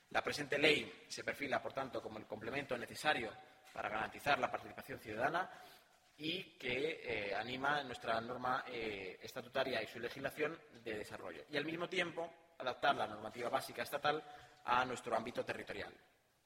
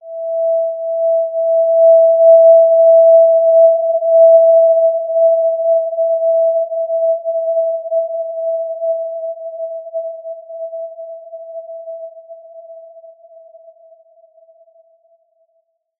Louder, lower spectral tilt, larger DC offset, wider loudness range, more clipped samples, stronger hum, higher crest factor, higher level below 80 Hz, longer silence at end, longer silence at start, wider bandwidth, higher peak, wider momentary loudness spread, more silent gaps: second, -40 LUFS vs -12 LUFS; second, -4 dB/octave vs -7 dB/octave; neither; second, 3 LU vs 21 LU; neither; neither; first, 24 dB vs 12 dB; first, -72 dBFS vs under -90 dBFS; second, 0.5 s vs 3.2 s; about the same, 0.1 s vs 0.05 s; first, 16 kHz vs 0.8 kHz; second, -16 dBFS vs -2 dBFS; second, 12 LU vs 22 LU; neither